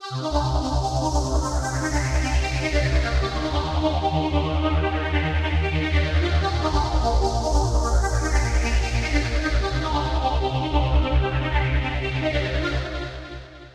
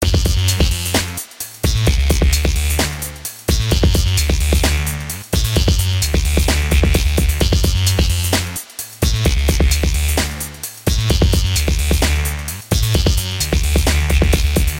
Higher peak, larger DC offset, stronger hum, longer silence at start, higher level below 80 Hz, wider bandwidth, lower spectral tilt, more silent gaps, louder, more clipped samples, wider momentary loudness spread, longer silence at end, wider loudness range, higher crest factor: second, -8 dBFS vs -2 dBFS; neither; neither; about the same, 0 s vs 0 s; second, -24 dBFS vs -18 dBFS; second, 11 kHz vs 17 kHz; first, -5.5 dB/octave vs -4 dB/octave; neither; second, -23 LUFS vs -17 LUFS; neither; second, 3 LU vs 7 LU; about the same, 0.05 s vs 0 s; about the same, 1 LU vs 1 LU; about the same, 14 dB vs 14 dB